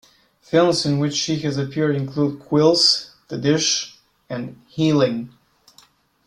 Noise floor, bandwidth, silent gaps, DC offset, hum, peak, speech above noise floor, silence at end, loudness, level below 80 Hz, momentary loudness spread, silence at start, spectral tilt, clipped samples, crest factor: -55 dBFS; 12 kHz; none; under 0.1%; none; -4 dBFS; 36 dB; 1 s; -19 LUFS; -60 dBFS; 15 LU; 0.5 s; -4.5 dB/octave; under 0.1%; 18 dB